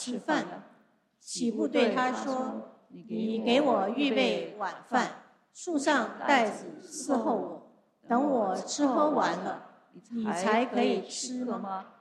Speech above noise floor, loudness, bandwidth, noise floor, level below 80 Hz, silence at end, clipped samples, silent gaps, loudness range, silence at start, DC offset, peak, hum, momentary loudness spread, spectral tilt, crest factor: 36 dB; -29 LUFS; 12 kHz; -65 dBFS; -78 dBFS; 0.15 s; under 0.1%; none; 2 LU; 0 s; under 0.1%; -10 dBFS; none; 14 LU; -4 dB/octave; 20 dB